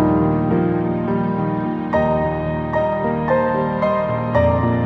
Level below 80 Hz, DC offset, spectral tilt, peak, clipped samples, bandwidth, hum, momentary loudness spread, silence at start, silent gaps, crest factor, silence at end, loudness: -38 dBFS; under 0.1%; -10 dB/octave; -2 dBFS; under 0.1%; 6 kHz; none; 4 LU; 0 s; none; 16 dB; 0 s; -19 LUFS